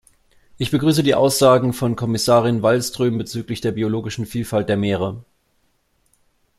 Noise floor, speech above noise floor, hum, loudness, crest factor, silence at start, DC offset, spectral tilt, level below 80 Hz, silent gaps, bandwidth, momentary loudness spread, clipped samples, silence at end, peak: -64 dBFS; 46 dB; none; -19 LUFS; 18 dB; 0.6 s; under 0.1%; -5.5 dB/octave; -52 dBFS; none; 15.5 kHz; 11 LU; under 0.1%; 1.4 s; -2 dBFS